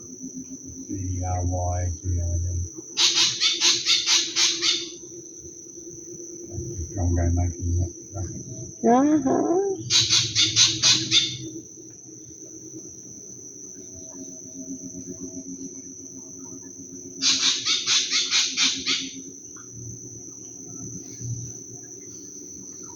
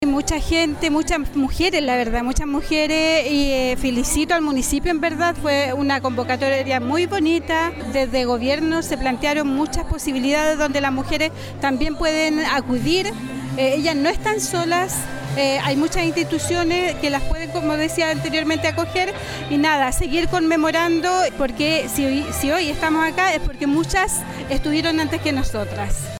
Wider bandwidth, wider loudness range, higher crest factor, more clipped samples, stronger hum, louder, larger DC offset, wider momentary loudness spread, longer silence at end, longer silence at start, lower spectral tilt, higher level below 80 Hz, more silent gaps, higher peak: about the same, 18 kHz vs 18 kHz; first, 17 LU vs 2 LU; first, 22 dB vs 14 dB; neither; neither; about the same, -21 LUFS vs -20 LUFS; neither; first, 21 LU vs 5 LU; about the same, 0 s vs 0 s; about the same, 0 s vs 0 s; second, -2.5 dB/octave vs -4 dB/octave; second, -50 dBFS vs -32 dBFS; neither; about the same, -4 dBFS vs -6 dBFS